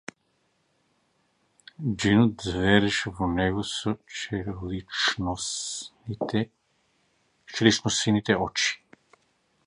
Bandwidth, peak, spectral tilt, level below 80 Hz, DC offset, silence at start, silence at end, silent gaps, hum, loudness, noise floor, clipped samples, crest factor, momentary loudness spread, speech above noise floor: 11 kHz; -4 dBFS; -4 dB/octave; -48 dBFS; under 0.1%; 1.8 s; 0.9 s; none; none; -26 LUFS; -71 dBFS; under 0.1%; 24 dB; 13 LU; 46 dB